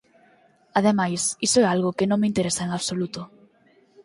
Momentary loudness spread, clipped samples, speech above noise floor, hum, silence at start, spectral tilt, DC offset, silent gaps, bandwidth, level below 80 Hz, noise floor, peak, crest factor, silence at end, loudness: 10 LU; under 0.1%; 37 dB; none; 0.75 s; -4 dB/octave; under 0.1%; none; 11.5 kHz; -60 dBFS; -59 dBFS; -6 dBFS; 18 dB; 0.8 s; -23 LUFS